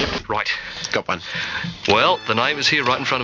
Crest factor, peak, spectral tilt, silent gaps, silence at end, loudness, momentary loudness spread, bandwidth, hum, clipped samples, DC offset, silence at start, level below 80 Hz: 20 dB; -2 dBFS; -3.5 dB/octave; none; 0 s; -20 LUFS; 8 LU; 8 kHz; none; under 0.1%; under 0.1%; 0 s; -46 dBFS